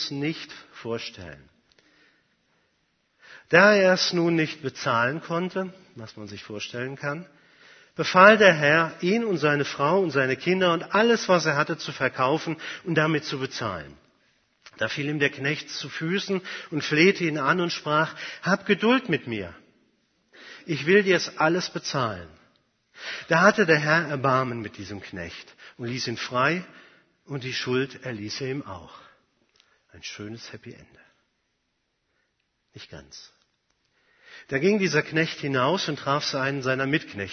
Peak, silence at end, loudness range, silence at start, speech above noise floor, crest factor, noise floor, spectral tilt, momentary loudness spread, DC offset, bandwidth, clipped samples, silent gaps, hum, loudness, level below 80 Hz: 0 dBFS; 0 s; 13 LU; 0 s; 51 dB; 26 dB; -75 dBFS; -5 dB/octave; 19 LU; under 0.1%; 6.6 kHz; under 0.1%; none; none; -23 LUFS; -66 dBFS